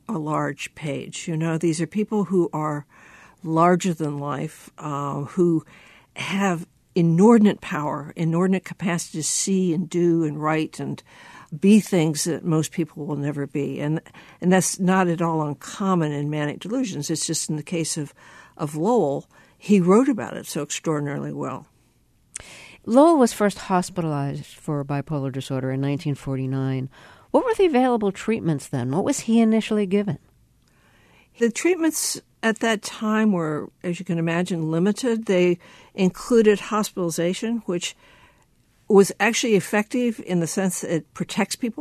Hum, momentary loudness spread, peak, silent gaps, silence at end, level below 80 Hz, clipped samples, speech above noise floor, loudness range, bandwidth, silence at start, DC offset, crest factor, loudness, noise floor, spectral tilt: none; 12 LU; -2 dBFS; none; 0 s; -60 dBFS; under 0.1%; 39 dB; 4 LU; 13.5 kHz; 0.1 s; under 0.1%; 20 dB; -22 LUFS; -61 dBFS; -5.5 dB/octave